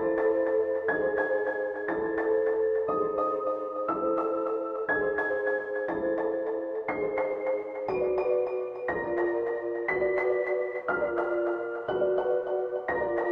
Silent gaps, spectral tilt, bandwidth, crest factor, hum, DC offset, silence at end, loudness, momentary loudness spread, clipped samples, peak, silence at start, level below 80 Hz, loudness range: none; -8 dB/octave; 5.2 kHz; 14 dB; none; under 0.1%; 0 s; -29 LUFS; 5 LU; under 0.1%; -14 dBFS; 0 s; -62 dBFS; 2 LU